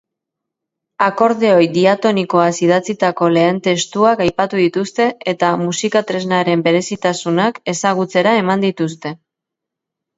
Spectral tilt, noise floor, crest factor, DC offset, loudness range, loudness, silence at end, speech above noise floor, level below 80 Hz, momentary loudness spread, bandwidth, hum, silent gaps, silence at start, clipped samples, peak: -5 dB/octave; -82 dBFS; 16 dB; under 0.1%; 3 LU; -15 LUFS; 1.05 s; 67 dB; -56 dBFS; 5 LU; 8 kHz; none; none; 1 s; under 0.1%; 0 dBFS